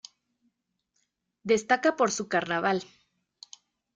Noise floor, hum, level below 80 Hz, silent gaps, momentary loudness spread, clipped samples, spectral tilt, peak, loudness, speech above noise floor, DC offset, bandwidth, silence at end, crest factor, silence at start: -78 dBFS; none; -72 dBFS; none; 7 LU; under 0.1%; -3.5 dB/octave; -10 dBFS; -26 LUFS; 52 dB; under 0.1%; 9.6 kHz; 1.1 s; 22 dB; 1.45 s